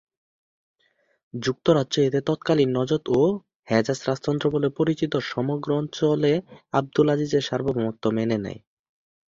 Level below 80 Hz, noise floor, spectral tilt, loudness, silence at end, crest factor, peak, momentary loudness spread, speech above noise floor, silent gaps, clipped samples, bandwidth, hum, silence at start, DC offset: -58 dBFS; -68 dBFS; -6.5 dB/octave; -24 LUFS; 0.7 s; 20 dB; -4 dBFS; 6 LU; 45 dB; 3.55-3.63 s; under 0.1%; 7.6 kHz; none; 1.35 s; under 0.1%